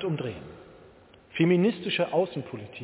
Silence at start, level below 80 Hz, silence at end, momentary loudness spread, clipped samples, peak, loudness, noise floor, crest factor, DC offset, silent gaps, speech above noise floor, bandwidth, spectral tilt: 0 s; -62 dBFS; 0 s; 17 LU; under 0.1%; -8 dBFS; -27 LUFS; -54 dBFS; 20 dB; under 0.1%; none; 27 dB; 4 kHz; -10.5 dB/octave